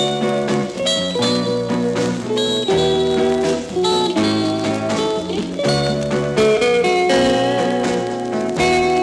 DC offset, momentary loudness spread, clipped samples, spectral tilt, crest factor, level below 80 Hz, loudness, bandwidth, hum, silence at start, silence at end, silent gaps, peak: under 0.1%; 5 LU; under 0.1%; -4.5 dB/octave; 14 dB; -46 dBFS; -18 LUFS; 12 kHz; none; 0 s; 0 s; none; -4 dBFS